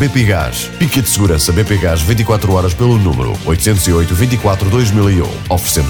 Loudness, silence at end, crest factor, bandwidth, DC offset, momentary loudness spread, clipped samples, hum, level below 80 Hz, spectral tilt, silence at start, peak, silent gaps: -13 LUFS; 0 s; 10 dB; over 20 kHz; under 0.1%; 4 LU; under 0.1%; none; -24 dBFS; -5 dB/octave; 0 s; -2 dBFS; none